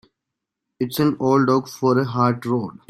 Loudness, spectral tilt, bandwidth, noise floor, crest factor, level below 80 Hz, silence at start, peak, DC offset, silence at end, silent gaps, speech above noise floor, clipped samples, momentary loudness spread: -20 LUFS; -7 dB/octave; 16 kHz; -83 dBFS; 16 dB; -62 dBFS; 0.8 s; -4 dBFS; under 0.1%; 0.2 s; none; 63 dB; under 0.1%; 7 LU